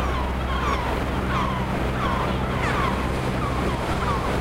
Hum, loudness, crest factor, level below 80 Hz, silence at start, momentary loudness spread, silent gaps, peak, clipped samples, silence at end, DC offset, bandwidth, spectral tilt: none; -24 LUFS; 14 dB; -30 dBFS; 0 s; 2 LU; none; -10 dBFS; under 0.1%; 0 s; under 0.1%; 16 kHz; -6 dB/octave